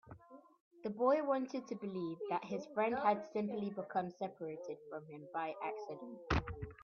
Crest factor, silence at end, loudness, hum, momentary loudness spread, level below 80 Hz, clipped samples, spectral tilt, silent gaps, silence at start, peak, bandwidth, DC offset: 20 dB; 0 s; -40 LUFS; none; 14 LU; -58 dBFS; under 0.1%; -5.5 dB/octave; 0.61-0.71 s; 0.05 s; -20 dBFS; 7 kHz; under 0.1%